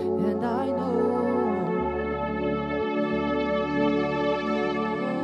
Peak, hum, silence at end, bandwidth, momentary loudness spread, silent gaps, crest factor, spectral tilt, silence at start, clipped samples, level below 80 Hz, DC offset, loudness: -14 dBFS; none; 0 s; 10 kHz; 3 LU; none; 12 dB; -8 dB/octave; 0 s; under 0.1%; -48 dBFS; under 0.1%; -26 LUFS